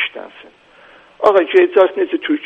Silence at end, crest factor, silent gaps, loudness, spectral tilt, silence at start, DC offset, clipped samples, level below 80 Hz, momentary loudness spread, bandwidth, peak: 0 s; 16 dB; none; -14 LUFS; -5 dB/octave; 0 s; under 0.1%; under 0.1%; -64 dBFS; 10 LU; 5.4 kHz; 0 dBFS